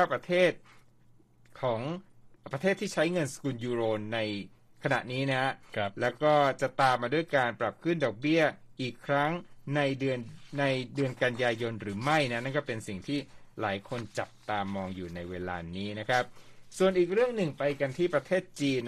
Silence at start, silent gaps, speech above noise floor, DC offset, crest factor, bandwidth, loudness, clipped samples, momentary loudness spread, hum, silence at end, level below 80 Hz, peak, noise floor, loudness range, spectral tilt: 0 s; none; 30 dB; under 0.1%; 18 dB; 13.5 kHz; -30 LUFS; under 0.1%; 11 LU; none; 0 s; -64 dBFS; -12 dBFS; -60 dBFS; 6 LU; -5.5 dB/octave